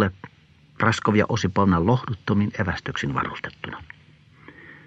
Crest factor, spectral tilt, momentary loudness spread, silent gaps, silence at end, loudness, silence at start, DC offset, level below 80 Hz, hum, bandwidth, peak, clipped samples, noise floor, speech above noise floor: 20 dB; -6.5 dB/octave; 15 LU; none; 0.1 s; -23 LUFS; 0 s; under 0.1%; -48 dBFS; none; 8.8 kHz; -4 dBFS; under 0.1%; -54 dBFS; 31 dB